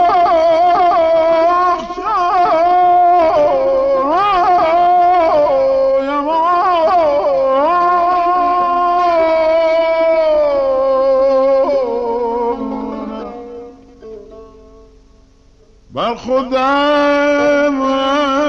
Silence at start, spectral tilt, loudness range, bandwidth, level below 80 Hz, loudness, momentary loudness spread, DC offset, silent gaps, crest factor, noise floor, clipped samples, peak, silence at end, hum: 0 s; -5 dB/octave; 11 LU; 6.8 kHz; -44 dBFS; -13 LUFS; 8 LU; under 0.1%; none; 8 dB; -47 dBFS; under 0.1%; -4 dBFS; 0 s; none